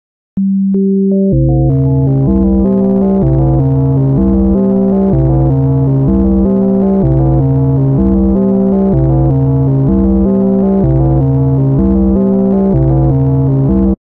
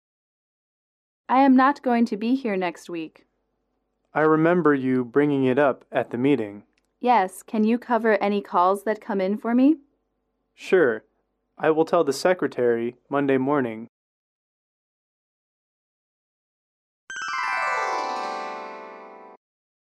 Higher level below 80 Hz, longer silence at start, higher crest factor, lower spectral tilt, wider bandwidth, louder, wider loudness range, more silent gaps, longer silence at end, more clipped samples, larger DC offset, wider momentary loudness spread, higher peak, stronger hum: first, -20 dBFS vs -74 dBFS; second, 0.35 s vs 1.3 s; second, 10 dB vs 16 dB; first, -14 dB/octave vs -6.5 dB/octave; second, 2.2 kHz vs 13.5 kHz; first, -11 LUFS vs -22 LUFS; second, 0 LU vs 7 LU; second, none vs 13.89-17.07 s; second, 0.25 s vs 0.55 s; neither; neither; second, 1 LU vs 15 LU; first, 0 dBFS vs -8 dBFS; neither